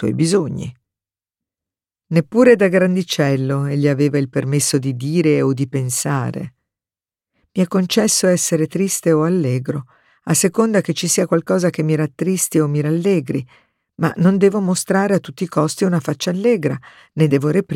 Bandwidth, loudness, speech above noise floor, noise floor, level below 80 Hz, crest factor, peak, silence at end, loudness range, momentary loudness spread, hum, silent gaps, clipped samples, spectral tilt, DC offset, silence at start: 16.5 kHz; -17 LUFS; over 73 dB; under -90 dBFS; -60 dBFS; 16 dB; -2 dBFS; 0 s; 3 LU; 8 LU; none; none; under 0.1%; -5.5 dB/octave; under 0.1%; 0 s